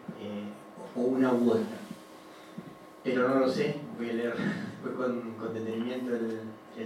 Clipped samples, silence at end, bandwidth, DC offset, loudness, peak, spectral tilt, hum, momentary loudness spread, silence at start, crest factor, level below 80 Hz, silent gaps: under 0.1%; 0 s; 15 kHz; under 0.1%; -31 LUFS; -14 dBFS; -7 dB/octave; none; 20 LU; 0 s; 18 dB; -78 dBFS; none